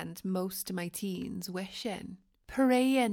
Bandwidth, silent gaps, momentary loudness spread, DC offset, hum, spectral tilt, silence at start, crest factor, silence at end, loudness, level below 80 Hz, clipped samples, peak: 18.5 kHz; none; 13 LU; under 0.1%; none; -5 dB/octave; 0 s; 18 dB; 0 s; -33 LUFS; -64 dBFS; under 0.1%; -14 dBFS